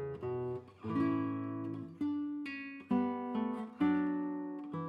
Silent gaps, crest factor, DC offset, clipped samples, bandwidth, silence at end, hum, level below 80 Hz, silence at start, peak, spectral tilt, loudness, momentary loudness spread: none; 16 dB; under 0.1%; under 0.1%; 5 kHz; 0 s; none; -74 dBFS; 0 s; -20 dBFS; -9 dB/octave; -37 LUFS; 9 LU